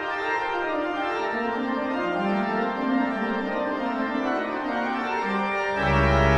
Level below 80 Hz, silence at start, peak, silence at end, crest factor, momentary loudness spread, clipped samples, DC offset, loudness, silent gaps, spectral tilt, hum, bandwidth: -38 dBFS; 0 s; -6 dBFS; 0 s; 18 dB; 4 LU; under 0.1%; under 0.1%; -25 LUFS; none; -7 dB/octave; none; 10 kHz